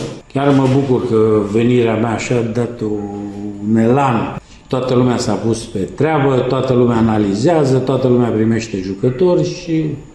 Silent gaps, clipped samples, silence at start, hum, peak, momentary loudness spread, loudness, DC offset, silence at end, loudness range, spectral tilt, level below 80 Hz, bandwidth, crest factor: none; under 0.1%; 0 s; none; 0 dBFS; 9 LU; -15 LUFS; under 0.1%; 0.05 s; 3 LU; -7 dB/octave; -42 dBFS; 11 kHz; 14 dB